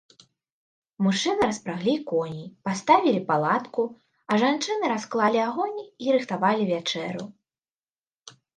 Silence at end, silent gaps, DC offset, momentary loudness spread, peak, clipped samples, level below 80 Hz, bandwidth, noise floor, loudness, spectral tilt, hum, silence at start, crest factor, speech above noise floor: 0.25 s; 7.70-7.83 s, 7.98-8.11 s; under 0.1%; 10 LU; -4 dBFS; under 0.1%; -68 dBFS; 10 kHz; under -90 dBFS; -25 LUFS; -5 dB/octave; none; 1 s; 22 dB; over 66 dB